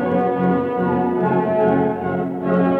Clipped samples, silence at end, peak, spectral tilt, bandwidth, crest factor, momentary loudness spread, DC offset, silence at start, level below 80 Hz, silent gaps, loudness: under 0.1%; 0 s; -6 dBFS; -10.5 dB/octave; 4.3 kHz; 12 dB; 5 LU; under 0.1%; 0 s; -60 dBFS; none; -19 LUFS